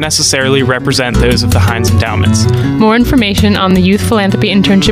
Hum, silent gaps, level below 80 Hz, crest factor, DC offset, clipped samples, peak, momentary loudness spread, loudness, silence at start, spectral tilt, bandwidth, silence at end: none; none; -24 dBFS; 10 dB; under 0.1%; under 0.1%; 0 dBFS; 3 LU; -10 LUFS; 0 s; -5 dB/octave; 16 kHz; 0 s